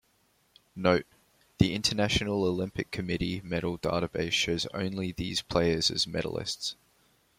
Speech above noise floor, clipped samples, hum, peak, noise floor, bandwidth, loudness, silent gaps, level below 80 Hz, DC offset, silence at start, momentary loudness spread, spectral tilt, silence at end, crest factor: 39 dB; under 0.1%; none; -6 dBFS; -69 dBFS; 16 kHz; -29 LUFS; none; -50 dBFS; under 0.1%; 0.75 s; 8 LU; -4.5 dB/octave; 0.65 s; 26 dB